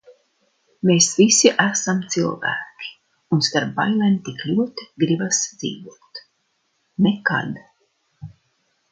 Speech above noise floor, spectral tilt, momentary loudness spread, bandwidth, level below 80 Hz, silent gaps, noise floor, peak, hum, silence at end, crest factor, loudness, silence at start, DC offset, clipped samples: 50 dB; -3.5 dB/octave; 21 LU; 9.6 kHz; -64 dBFS; none; -69 dBFS; 0 dBFS; none; 0.65 s; 22 dB; -19 LUFS; 0.1 s; under 0.1%; under 0.1%